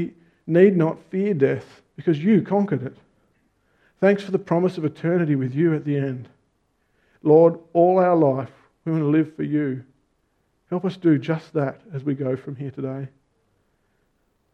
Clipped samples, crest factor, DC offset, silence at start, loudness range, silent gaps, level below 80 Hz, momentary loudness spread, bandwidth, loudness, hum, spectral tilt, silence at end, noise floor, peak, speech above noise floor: under 0.1%; 18 dB; under 0.1%; 0 s; 6 LU; none; -68 dBFS; 14 LU; 7 kHz; -21 LUFS; none; -9.5 dB/octave; 1.45 s; -68 dBFS; -4 dBFS; 48 dB